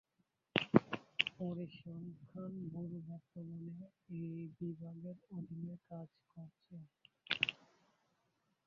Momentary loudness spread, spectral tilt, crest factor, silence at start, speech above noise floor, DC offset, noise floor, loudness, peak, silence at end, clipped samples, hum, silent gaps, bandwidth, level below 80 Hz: 21 LU; -4 dB/octave; 32 dB; 0.55 s; 35 dB; under 0.1%; -83 dBFS; -42 LUFS; -12 dBFS; 1.1 s; under 0.1%; none; none; 7.2 kHz; -76 dBFS